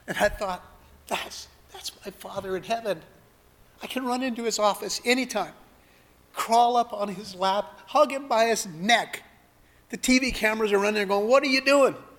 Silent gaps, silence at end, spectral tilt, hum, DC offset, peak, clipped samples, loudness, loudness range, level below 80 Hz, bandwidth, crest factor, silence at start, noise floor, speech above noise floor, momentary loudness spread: none; 0.15 s; -3 dB/octave; none; under 0.1%; -6 dBFS; under 0.1%; -25 LUFS; 10 LU; -52 dBFS; 19 kHz; 20 dB; 0.05 s; -58 dBFS; 33 dB; 17 LU